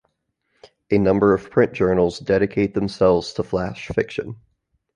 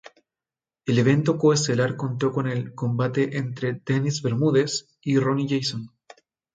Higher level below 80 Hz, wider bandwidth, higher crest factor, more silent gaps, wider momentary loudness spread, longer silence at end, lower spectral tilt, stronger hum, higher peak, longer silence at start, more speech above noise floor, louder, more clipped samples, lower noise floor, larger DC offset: first, -44 dBFS vs -64 dBFS; about the same, 10 kHz vs 9.4 kHz; about the same, 18 dB vs 18 dB; neither; about the same, 8 LU vs 9 LU; about the same, 0.6 s vs 0.7 s; about the same, -7 dB/octave vs -6 dB/octave; neither; first, -2 dBFS vs -6 dBFS; about the same, 0.9 s vs 0.85 s; second, 53 dB vs over 67 dB; first, -20 LUFS vs -23 LUFS; neither; second, -72 dBFS vs under -90 dBFS; neither